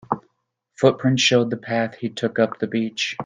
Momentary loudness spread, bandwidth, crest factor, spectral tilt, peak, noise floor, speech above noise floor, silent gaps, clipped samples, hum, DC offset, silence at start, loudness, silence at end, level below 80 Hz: 9 LU; 9.8 kHz; 20 dB; -4.5 dB/octave; -2 dBFS; -74 dBFS; 53 dB; none; under 0.1%; none; under 0.1%; 0.1 s; -21 LUFS; 0 s; -64 dBFS